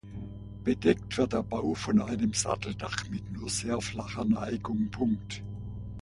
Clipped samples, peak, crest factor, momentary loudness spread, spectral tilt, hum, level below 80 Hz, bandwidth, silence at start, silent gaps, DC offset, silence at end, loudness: under 0.1%; -10 dBFS; 20 dB; 13 LU; -5 dB/octave; 60 Hz at -50 dBFS; -48 dBFS; 11.5 kHz; 0.05 s; none; under 0.1%; 0 s; -31 LUFS